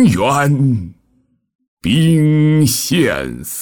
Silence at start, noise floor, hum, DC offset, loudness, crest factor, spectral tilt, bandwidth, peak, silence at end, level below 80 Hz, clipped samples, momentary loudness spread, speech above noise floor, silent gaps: 0 s; -59 dBFS; none; under 0.1%; -14 LUFS; 12 dB; -5.5 dB/octave; 19.5 kHz; -2 dBFS; 0 s; -44 dBFS; under 0.1%; 11 LU; 46 dB; 1.55-1.59 s, 1.68-1.77 s